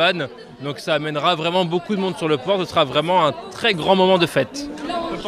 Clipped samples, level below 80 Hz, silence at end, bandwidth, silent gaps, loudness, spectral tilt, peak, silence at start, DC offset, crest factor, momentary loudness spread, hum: under 0.1%; -54 dBFS; 0 s; 15 kHz; none; -19 LUFS; -5 dB/octave; -4 dBFS; 0 s; under 0.1%; 16 dB; 11 LU; none